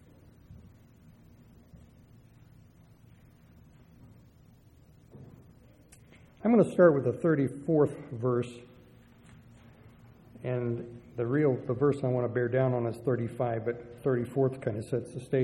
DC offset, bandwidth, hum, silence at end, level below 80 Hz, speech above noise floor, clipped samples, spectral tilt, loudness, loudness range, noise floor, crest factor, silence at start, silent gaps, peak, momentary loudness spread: under 0.1%; 12 kHz; none; 0 s; -64 dBFS; 30 dB; under 0.1%; -9 dB/octave; -29 LUFS; 7 LU; -58 dBFS; 22 dB; 0.5 s; none; -10 dBFS; 12 LU